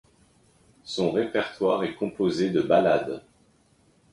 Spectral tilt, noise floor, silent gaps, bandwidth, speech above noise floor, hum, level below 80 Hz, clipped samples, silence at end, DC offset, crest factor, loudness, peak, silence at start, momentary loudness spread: -6 dB/octave; -62 dBFS; none; 11.5 kHz; 38 dB; none; -62 dBFS; under 0.1%; 0.95 s; under 0.1%; 18 dB; -25 LUFS; -8 dBFS; 0.85 s; 14 LU